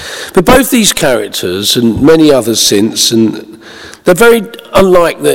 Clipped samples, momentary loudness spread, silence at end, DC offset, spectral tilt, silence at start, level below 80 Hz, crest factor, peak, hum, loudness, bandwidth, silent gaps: 3%; 7 LU; 0 s; under 0.1%; -3.5 dB/octave; 0 s; -32 dBFS; 8 dB; 0 dBFS; none; -8 LUFS; over 20 kHz; none